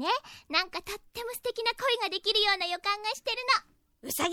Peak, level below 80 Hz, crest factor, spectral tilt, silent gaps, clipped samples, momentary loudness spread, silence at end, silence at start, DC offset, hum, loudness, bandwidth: -10 dBFS; -62 dBFS; 20 dB; -0.5 dB/octave; none; under 0.1%; 13 LU; 0 s; 0 s; under 0.1%; none; -29 LUFS; 19 kHz